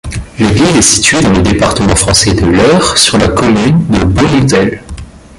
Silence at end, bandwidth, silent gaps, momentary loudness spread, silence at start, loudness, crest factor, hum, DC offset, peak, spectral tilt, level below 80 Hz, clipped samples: 0.2 s; 16 kHz; none; 8 LU; 0.05 s; -8 LUFS; 8 dB; none; under 0.1%; 0 dBFS; -4 dB/octave; -24 dBFS; 0.2%